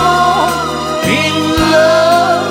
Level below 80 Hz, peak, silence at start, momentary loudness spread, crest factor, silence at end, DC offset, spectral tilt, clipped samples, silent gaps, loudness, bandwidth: -34 dBFS; 0 dBFS; 0 s; 7 LU; 10 dB; 0 s; under 0.1%; -4 dB/octave; under 0.1%; none; -11 LUFS; 17 kHz